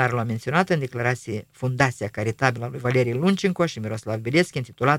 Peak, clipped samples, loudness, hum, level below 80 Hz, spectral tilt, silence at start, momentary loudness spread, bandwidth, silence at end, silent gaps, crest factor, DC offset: -2 dBFS; under 0.1%; -24 LUFS; none; -58 dBFS; -6 dB/octave; 0 s; 7 LU; 16 kHz; 0 s; none; 22 dB; under 0.1%